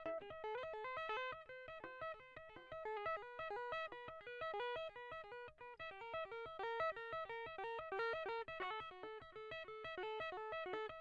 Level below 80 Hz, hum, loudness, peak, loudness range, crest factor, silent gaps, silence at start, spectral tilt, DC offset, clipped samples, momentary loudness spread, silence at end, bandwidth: -74 dBFS; none; -47 LUFS; -32 dBFS; 3 LU; 16 dB; none; 0 s; -4.5 dB/octave; under 0.1%; under 0.1%; 10 LU; 0 s; 8.4 kHz